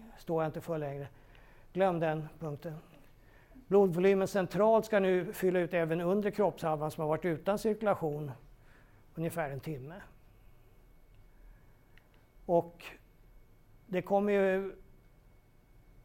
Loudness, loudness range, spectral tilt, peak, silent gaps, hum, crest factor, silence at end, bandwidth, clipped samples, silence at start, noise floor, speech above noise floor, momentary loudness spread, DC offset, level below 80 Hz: -32 LUFS; 13 LU; -7 dB/octave; -14 dBFS; none; none; 20 dB; 0.05 s; 16.5 kHz; under 0.1%; 0 s; -61 dBFS; 30 dB; 18 LU; under 0.1%; -60 dBFS